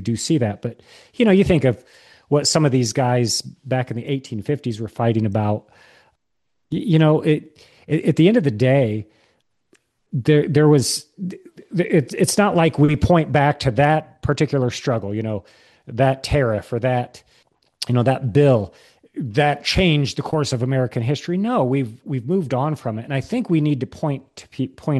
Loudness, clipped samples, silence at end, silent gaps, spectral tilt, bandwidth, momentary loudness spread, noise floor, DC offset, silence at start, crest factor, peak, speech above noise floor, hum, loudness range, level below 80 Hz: -19 LUFS; under 0.1%; 0 s; none; -6 dB/octave; 12.5 kHz; 12 LU; -77 dBFS; under 0.1%; 0 s; 18 dB; -2 dBFS; 59 dB; none; 4 LU; -44 dBFS